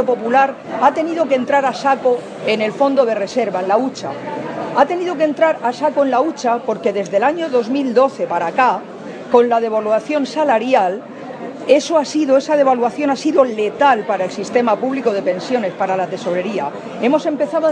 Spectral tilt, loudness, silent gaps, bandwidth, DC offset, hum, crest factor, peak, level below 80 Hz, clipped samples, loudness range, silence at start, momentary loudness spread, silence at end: -5 dB/octave; -17 LUFS; none; 9.8 kHz; under 0.1%; none; 16 dB; 0 dBFS; -68 dBFS; under 0.1%; 2 LU; 0 s; 7 LU; 0 s